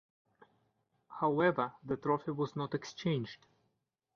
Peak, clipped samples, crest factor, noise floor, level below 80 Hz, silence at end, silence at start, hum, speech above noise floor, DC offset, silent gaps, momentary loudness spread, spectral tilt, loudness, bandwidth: -16 dBFS; under 0.1%; 22 dB; -82 dBFS; -74 dBFS; 0.8 s; 1.1 s; none; 48 dB; under 0.1%; none; 12 LU; -5.5 dB/octave; -35 LUFS; 7 kHz